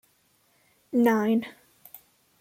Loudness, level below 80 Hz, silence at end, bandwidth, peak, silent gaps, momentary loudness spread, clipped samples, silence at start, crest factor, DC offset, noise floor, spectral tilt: -25 LUFS; -74 dBFS; 0.45 s; 16.5 kHz; -10 dBFS; none; 26 LU; under 0.1%; 0.95 s; 18 dB; under 0.1%; -66 dBFS; -6.5 dB/octave